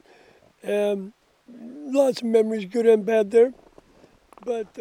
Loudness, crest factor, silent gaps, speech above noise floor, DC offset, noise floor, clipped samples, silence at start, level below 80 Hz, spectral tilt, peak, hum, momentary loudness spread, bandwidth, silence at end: -22 LUFS; 18 dB; none; 34 dB; under 0.1%; -55 dBFS; under 0.1%; 0.65 s; -68 dBFS; -5.5 dB/octave; -6 dBFS; none; 19 LU; 14.5 kHz; 0 s